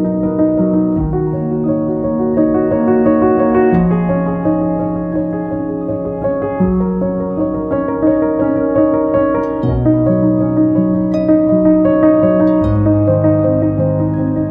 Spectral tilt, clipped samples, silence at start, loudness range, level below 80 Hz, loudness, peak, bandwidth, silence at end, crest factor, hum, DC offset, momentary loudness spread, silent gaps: -12 dB/octave; under 0.1%; 0 s; 5 LU; -34 dBFS; -14 LUFS; 0 dBFS; 3.6 kHz; 0 s; 12 dB; none; under 0.1%; 7 LU; none